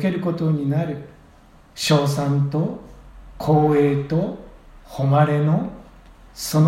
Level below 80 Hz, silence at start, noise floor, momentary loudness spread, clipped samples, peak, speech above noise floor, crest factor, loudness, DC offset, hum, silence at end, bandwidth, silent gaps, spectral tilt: -48 dBFS; 0 s; -49 dBFS; 15 LU; under 0.1%; -2 dBFS; 30 dB; 18 dB; -20 LUFS; under 0.1%; none; 0 s; 14.5 kHz; none; -6.5 dB/octave